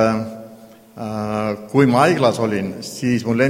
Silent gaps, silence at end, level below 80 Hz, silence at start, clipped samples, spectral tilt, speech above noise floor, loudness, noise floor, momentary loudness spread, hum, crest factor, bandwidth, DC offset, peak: none; 0 s; -54 dBFS; 0 s; under 0.1%; -6 dB/octave; 26 dB; -19 LUFS; -43 dBFS; 15 LU; none; 18 dB; 16.5 kHz; under 0.1%; 0 dBFS